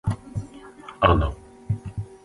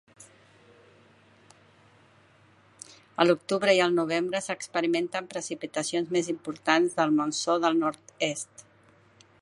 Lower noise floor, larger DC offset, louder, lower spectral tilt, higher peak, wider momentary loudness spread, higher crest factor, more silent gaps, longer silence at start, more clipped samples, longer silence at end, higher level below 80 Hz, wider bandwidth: second, -43 dBFS vs -59 dBFS; neither; about the same, -25 LUFS vs -27 LUFS; first, -7.5 dB/octave vs -4 dB/octave; about the same, -2 dBFS vs -4 dBFS; first, 23 LU vs 12 LU; about the same, 24 dB vs 24 dB; neither; second, 0.05 s vs 0.2 s; neither; second, 0.1 s vs 0.8 s; first, -34 dBFS vs -76 dBFS; about the same, 11.5 kHz vs 11.5 kHz